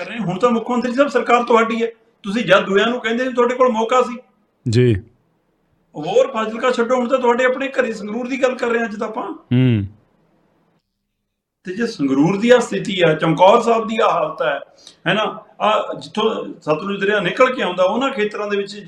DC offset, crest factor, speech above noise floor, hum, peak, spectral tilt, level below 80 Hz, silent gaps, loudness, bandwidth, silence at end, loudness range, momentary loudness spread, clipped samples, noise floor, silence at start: under 0.1%; 18 dB; 58 dB; none; 0 dBFS; -6 dB/octave; -60 dBFS; none; -17 LUFS; 10.5 kHz; 0 s; 5 LU; 11 LU; under 0.1%; -75 dBFS; 0 s